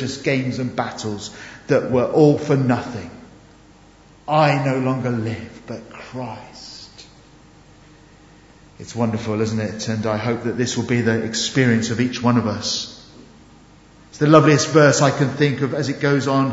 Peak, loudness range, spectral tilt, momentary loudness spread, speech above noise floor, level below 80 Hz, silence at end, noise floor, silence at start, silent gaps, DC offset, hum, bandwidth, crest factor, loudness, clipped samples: 0 dBFS; 13 LU; -5.5 dB/octave; 20 LU; 30 dB; -54 dBFS; 0 s; -48 dBFS; 0 s; none; under 0.1%; none; 8 kHz; 20 dB; -19 LUFS; under 0.1%